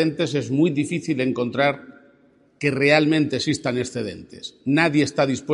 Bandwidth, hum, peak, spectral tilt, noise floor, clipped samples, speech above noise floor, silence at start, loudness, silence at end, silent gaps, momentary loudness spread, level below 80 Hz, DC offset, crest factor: 11 kHz; none; -2 dBFS; -5.5 dB/octave; -57 dBFS; under 0.1%; 36 dB; 0 s; -21 LUFS; 0 s; none; 13 LU; -62 dBFS; under 0.1%; 20 dB